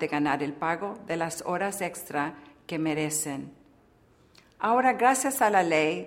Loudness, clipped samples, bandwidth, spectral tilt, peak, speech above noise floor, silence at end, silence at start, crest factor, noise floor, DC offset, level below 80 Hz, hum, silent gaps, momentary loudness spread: -27 LUFS; under 0.1%; 16 kHz; -4 dB/octave; -8 dBFS; 33 dB; 0 s; 0 s; 20 dB; -60 dBFS; under 0.1%; -68 dBFS; none; none; 12 LU